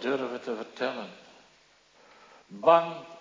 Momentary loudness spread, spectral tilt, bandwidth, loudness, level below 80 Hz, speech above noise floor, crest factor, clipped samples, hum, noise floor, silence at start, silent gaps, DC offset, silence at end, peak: 19 LU; -5.5 dB/octave; 7.6 kHz; -27 LUFS; -82 dBFS; 33 dB; 24 dB; under 0.1%; none; -61 dBFS; 0 s; none; under 0.1%; 0 s; -6 dBFS